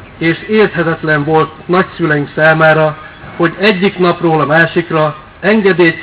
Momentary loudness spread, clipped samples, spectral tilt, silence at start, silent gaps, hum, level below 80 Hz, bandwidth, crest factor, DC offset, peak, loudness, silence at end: 7 LU; under 0.1%; -10 dB/octave; 0 s; none; none; -44 dBFS; 4 kHz; 12 dB; under 0.1%; 0 dBFS; -11 LUFS; 0 s